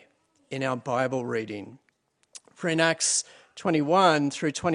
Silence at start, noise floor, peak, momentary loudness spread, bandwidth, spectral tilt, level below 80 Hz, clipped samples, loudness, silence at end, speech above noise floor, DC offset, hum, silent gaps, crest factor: 0.5 s; -64 dBFS; -6 dBFS; 17 LU; 11 kHz; -3.5 dB/octave; -72 dBFS; under 0.1%; -25 LUFS; 0 s; 38 dB; under 0.1%; none; none; 22 dB